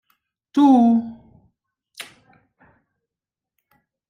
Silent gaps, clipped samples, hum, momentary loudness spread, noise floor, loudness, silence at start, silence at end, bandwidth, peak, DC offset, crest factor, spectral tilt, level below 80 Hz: none; under 0.1%; none; 25 LU; -88 dBFS; -17 LUFS; 0.55 s; 2.05 s; 13 kHz; -6 dBFS; under 0.1%; 18 dB; -6.5 dB/octave; -66 dBFS